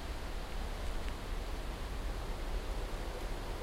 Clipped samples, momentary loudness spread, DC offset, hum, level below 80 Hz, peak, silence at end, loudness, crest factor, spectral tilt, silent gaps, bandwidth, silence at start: under 0.1%; 1 LU; under 0.1%; none; -40 dBFS; -24 dBFS; 0 s; -43 LUFS; 16 dB; -5 dB/octave; none; 16 kHz; 0 s